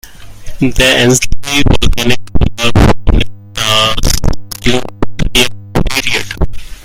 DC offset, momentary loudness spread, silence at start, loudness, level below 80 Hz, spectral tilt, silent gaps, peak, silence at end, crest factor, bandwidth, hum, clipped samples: under 0.1%; 10 LU; 0.05 s; -12 LUFS; -18 dBFS; -4 dB/octave; none; 0 dBFS; 0 s; 10 dB; 16.5 kHz; none; 1%